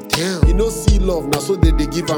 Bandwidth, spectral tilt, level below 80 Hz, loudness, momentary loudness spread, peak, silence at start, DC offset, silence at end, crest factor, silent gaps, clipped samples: 18 kHz; -5.5 dB/octave; -18 dBFS; -17 LUFS; 3 LU; 0 dBFS; 0 s; under 0.1%; 0 s; 16 dB; none; under 0.1%